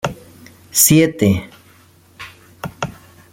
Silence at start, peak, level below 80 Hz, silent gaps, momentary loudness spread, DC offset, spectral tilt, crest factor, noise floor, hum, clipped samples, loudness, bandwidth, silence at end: 0.05 s; 0 dBFS; -50 dBFS; none; 25 LU; under 0.1%; -4 dB/octave; 20 dB; -49 dBFS; none; under 0.1%; -14 LUFS; 17 kHz; 0.4 s